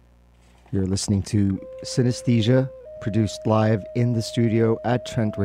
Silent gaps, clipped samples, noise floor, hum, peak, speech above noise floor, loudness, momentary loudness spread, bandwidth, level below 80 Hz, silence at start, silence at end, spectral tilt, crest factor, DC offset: none; under 0.1%; -54 dBFS; 60 Hz at -40 dBFS; -6 dBFS; 32 dB; -23 LUFS; 7 LU; 13 kHz; -50 dBFS; 0.7 s; 0 s; -6.5 dB/octave; 16 dB; under 0.1%